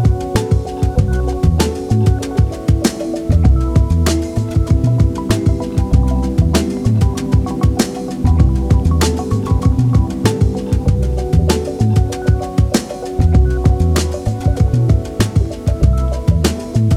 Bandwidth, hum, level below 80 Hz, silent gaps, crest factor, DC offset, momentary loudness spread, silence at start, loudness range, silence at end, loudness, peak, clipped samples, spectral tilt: 15 kHz; none; -20 dBFS; none; 12 dB; under 0.1%; 4 LU; 0 s; 1 LU; 0 s; -15 LUFS; 0 dBFS; under 0.1%; -6.5 dB/octave